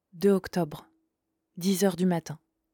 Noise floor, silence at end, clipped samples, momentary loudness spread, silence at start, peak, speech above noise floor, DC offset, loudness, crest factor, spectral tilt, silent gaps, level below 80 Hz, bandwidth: -81 dBFS; 0.4 s; under 0.1%; 18 LU; 0.15 s; -12 dBFS; 54 dB; under 0.1%; -28 LUFS; 16 dB; -6 dB/octave; none; -64 dBFS; 19 kHz